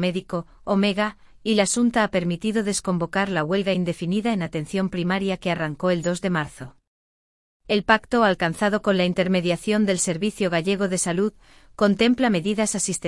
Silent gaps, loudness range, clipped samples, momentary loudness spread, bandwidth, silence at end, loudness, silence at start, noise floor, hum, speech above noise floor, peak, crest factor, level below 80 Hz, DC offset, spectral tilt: 6.87-7.60 s; 4 LU; under 0.1%; 7 LU; 12 kHz; 0 s; -23 LUFS; 0 s; under -90 dBFS; none; over 68 dB; -4 dBFS; 20 dB; -52 dBFS; under 0.1%; -4.5 dB/octave